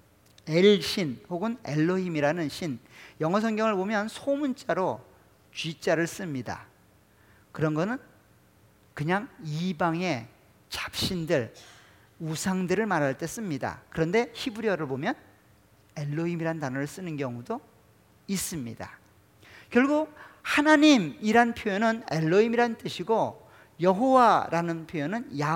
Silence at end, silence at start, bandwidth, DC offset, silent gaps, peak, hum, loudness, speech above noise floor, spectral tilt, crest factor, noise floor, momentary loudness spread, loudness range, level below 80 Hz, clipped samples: 0 s; 0.45 s; 17.5 kHz; under 0.1%; none; -6 dBFS; none; -27 LUFS; 34 dB; -5.5 dB/octave; 22 dB; -60 dBFS; 15 LU; 10 LU; -62 dBFS; under 0.1%